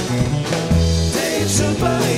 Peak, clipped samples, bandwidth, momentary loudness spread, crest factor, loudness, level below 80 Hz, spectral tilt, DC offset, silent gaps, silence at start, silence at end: -4 dBFS; under 0.1%; 16 kHz; 3 LU; 14 dB; -18 LUFS; -28 dBFS; -5 dB/octave; under 0.1%; none; 0 s; 0 s